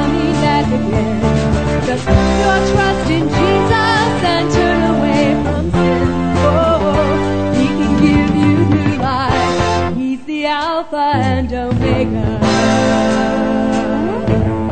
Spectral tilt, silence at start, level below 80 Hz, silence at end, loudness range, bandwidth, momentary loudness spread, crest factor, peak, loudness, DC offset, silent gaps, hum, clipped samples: -6.5 dB/octave; 0 s; -26 dBFS; 0 s; 2 LU; 9.2 kHz; 5 LU; 14 dB; 0 dBFS; -14 LUFS; 2%; none; none; under 0.1%